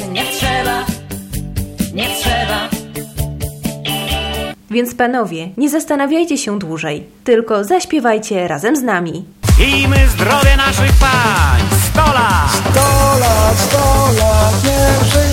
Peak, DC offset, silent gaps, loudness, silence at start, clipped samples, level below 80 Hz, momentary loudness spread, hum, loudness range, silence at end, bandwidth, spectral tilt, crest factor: 0 dBFS; under 0.1%; none; -14 LUFS; 0 s; under 0.1%; -20 dBFS; 12 LU; none; 8 LU; 0 s; 16.5 kHz; -4.5 dB/octave; 14 dB